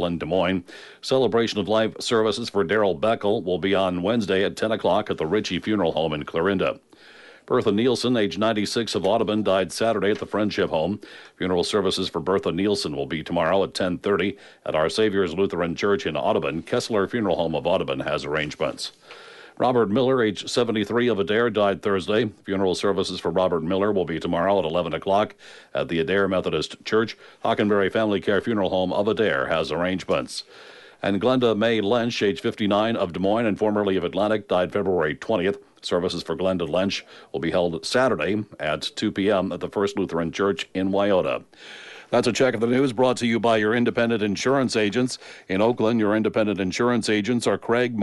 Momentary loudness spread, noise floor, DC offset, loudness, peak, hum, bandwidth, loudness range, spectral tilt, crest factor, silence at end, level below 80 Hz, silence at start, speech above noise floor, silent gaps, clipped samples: 6 LU; -44 dBFS; under 0.1%; -23 LUFS; -8 dBFS; none; 11.5 kHz; 2 LU; -5.5 dB/octave; 14 dB; 0 s; -56 dBFS; 0 s; 22 dB; none; under 0.1%